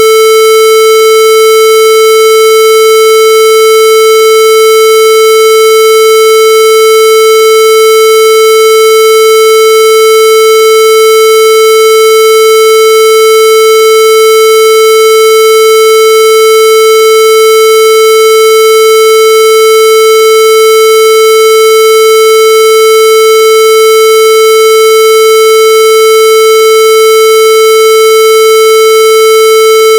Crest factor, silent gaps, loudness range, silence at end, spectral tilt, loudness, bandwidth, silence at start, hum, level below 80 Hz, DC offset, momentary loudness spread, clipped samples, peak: 2 dB; none; 0 LU; 0 s; 1.5 dB/octave; -2 LUFS; 17.5 kHz; 0 s; 60 Hz at -50 dBFS; -52 dBFS; under 0.1%; 0 LU; 0.2%; 0 dBFS